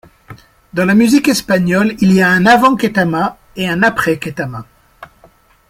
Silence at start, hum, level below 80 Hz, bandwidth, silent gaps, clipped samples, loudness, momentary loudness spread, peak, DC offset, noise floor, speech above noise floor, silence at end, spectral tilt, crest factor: 0.3 s; none; -46 dBFS; 16 kHz; none; under 0.1%; -12 LUFS; 13 LU; 0 dBFS; under 0.1%; -48 dBFS; 36 dB; 0.65 s; -5.5 dB/octave; 14 dB